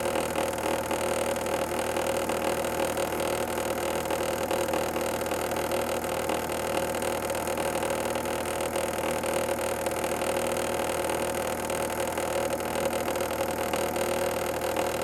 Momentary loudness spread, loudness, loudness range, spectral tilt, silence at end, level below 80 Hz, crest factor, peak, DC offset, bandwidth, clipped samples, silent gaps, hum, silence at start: 1 LU; -29 LUFS; 1 LU; -3.5 dB/octave; 0 s; -52 dBFS; 18 dB; -12 dBFS; under 0.1%; 17 kHz; under 0.1%; none; 50 Hz at -60 dBFS; 0 s